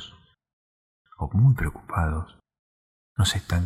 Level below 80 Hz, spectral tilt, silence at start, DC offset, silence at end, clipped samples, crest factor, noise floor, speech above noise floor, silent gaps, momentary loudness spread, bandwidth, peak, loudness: -38 dBFS; -5.5 dB/octave; 0 s; under 0.1%; 0 s; under 0.1%; 16 dB; -50 dBFS; 27 dB; 0.53-1.05 s, 2.59-3.16 s; 17 LU; 15 kHz; -10 dBFS; -25 LUFS